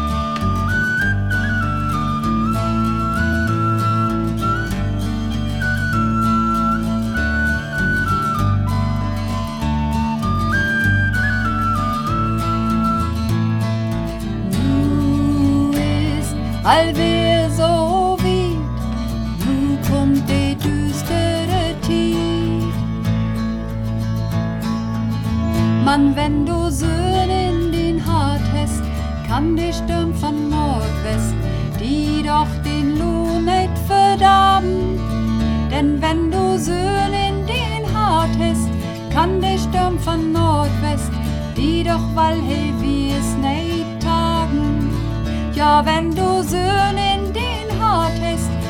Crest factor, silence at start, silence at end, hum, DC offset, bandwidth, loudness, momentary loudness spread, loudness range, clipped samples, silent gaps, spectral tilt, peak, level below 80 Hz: 16 dB; 0 s; 0 s; none; 0.3%; 17.5 kHz; -18 LUFS; 6 LU; 3 LU; under 0.1%; none; -6 dB/octave; 0 dBFS; -28 dBFS